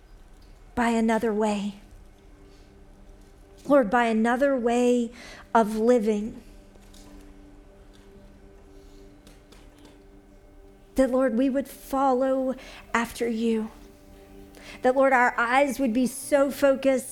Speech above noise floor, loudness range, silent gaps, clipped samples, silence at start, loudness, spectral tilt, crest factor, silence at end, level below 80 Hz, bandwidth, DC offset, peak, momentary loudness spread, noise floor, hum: 28 dB; 6 LU; none; under 0.1%; 0.1 s; -24 LUFS; -5 dB/octave; 20 dB; 0 s; -52 dBFS; 18.5 kHz; under 0.1%; -6 dBFS; 12 LU; -51 dBFS; none